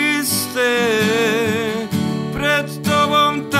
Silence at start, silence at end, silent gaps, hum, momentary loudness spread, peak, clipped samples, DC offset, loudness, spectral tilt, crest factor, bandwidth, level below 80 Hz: 0 s; 0 s; none; none; 6 LU; -2 dBFS; under 0.1%; under 0.1%; -17 LUFS; -4 dB/octave; 16 dB; 16 kHz; -48 dBFS